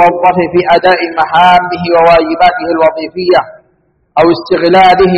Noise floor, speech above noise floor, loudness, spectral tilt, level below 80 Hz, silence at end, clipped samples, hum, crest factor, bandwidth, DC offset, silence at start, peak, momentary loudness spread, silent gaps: -54 dBFS; 47 dB; -8 LUFS; -6.5 dB/octave; -40 dBFS; 0 s; 0.8%; none; 8 dB; 8.2 kHz; under 0.1%; 0 s; 0 dBFS; 6 LU; none